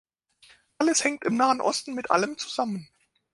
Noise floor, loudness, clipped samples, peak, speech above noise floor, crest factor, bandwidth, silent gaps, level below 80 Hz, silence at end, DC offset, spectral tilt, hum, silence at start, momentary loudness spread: -59 dBFS; -25 LUFS; under 0.1%; -6 dBFS; 33 dB; 22 dB; 11.5 kHz; none; -72 dBFS; 0.5 s; under 0.1%; -3 dB/octave; none; 0.8 s; 8 LU